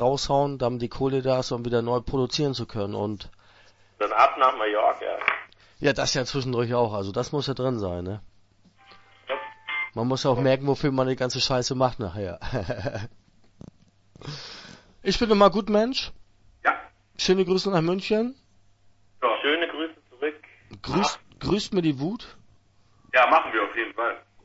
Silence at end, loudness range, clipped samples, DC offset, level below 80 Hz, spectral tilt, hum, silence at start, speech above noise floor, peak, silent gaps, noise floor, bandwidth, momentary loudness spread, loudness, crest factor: 0.25 s; 5 LU; under 0.1%; under 0.1%; -48 dBFS; -5 dB/octave; none; 0 s; 35 dB; -4 dBFS; none; -59 dBFS; 8 kHz; 13 LU; -25 LUFS; 22 dB